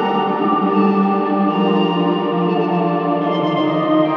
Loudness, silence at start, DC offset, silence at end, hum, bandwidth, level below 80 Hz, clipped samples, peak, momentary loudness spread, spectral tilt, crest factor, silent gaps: -17 LUFS; 0 s; under 0.1%; 0 s; none; 5.8 kHz; -84 dBFS; under 0.1%; -4 dBFS; 3 LU; -9 dB/octave; 12 dB; none